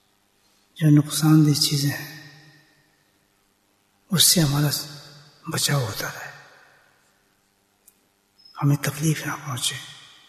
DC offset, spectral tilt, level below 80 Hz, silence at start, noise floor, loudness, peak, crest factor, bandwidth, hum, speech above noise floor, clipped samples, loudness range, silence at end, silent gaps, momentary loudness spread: under 0.1%; -4 dB/octave; -56 dBFS; 0.75 s; -65 dBFS; -21 LUFS; -4 dBFS; 20 dB; 14 kHz; none; 45 dB; under 0.1%; 8 LU; 0.35 s; none; 21 LU